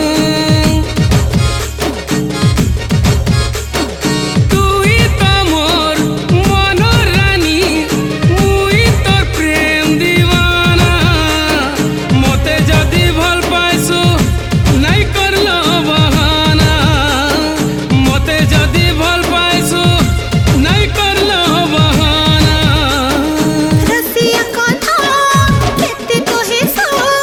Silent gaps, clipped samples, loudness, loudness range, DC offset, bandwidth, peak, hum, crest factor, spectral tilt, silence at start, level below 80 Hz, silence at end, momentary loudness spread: none; under 0.1%; -11 LUFS; 2 LU; under 0.1%; 18.5 kHz; 0 dBFS; none; 10 dB; -4.5 dB/octave; 0 s; -20 dBFS; 0 s; 4 LU